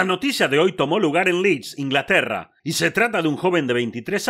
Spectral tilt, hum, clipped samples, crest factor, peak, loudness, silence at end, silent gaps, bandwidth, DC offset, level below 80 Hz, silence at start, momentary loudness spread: -4.5 dB/octave; none; under 0.1%; 16 dB; -4 dBFS; -20 LUFS; 0 s; none; 16 kHz; under 0.1%; -62 dBFS; 0 s; 6 LU